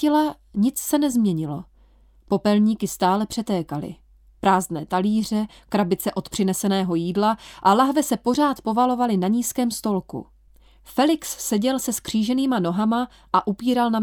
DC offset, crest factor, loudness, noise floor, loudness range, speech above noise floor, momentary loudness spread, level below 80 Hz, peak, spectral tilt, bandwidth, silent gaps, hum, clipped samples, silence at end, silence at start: under 0.1%; 18 dB; -22 LUFS; -54 dBFS; 3 LU; 32 dB; 6 LU; -54 dBFS; -4 dBFS; -5 dB/octave; 19.5 kHz; none; none; under 0.1%; 0 s; 0 s